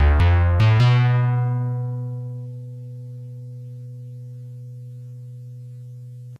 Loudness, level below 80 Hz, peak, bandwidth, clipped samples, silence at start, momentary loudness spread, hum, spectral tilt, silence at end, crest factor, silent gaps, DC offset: -19 LUFS; -30 dBFS; -8 dBFS; 6.4 kHz; under 0.1%; 0 s; 22 LU; none; -8 dB/octave; 0.05 s; 12 dB; none; under 0.1%